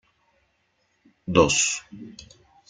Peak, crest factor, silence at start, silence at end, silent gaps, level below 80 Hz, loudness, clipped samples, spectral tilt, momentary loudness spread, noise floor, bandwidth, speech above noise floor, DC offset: -4 dBFS; 24 dB; 1.3 s; 0.6 s; none; -52 dBFS; -21 LUFS; under 0.1%; -3 dB/octave; 24 LU; -70 dBFS; 9.8 kHz; 46 dB; under 0.1%